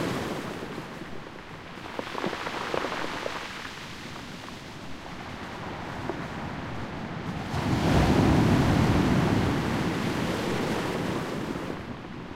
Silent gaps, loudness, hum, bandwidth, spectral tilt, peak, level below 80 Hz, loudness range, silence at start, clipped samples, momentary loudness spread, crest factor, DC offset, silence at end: none; -29 LUFS; none; 16 kHz; -6 dB/octave; -10 dBFS; -42 dBFS; 12 LU; 0 s; under 0.1%; 17 LU; 18 dB; 0.1%; 0 s